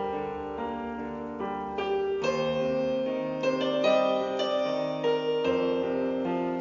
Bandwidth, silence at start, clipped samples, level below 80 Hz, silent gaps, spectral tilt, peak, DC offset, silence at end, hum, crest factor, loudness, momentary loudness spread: 7.4 kHz; 0 s; under 0.1%; -60 dBFS; none; -3.5 dB/octave; -12 dBFS; under 0.1%; 0 s; none; 16 dB; -29 LUFS; 9 LU